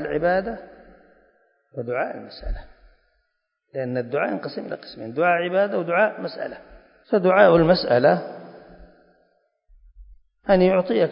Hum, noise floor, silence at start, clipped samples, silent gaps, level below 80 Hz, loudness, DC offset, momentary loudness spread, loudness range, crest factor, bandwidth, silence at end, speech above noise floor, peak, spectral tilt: none; -74 dBFS; 0 s; under 0.1%; none; -44 dBFS; -21 LUFS; under 0.1%; 19 LU; 11 LU; 20 dB; 5.4 kHz; 0 s; 54 dB; -2 dBFS; -11 dB/octave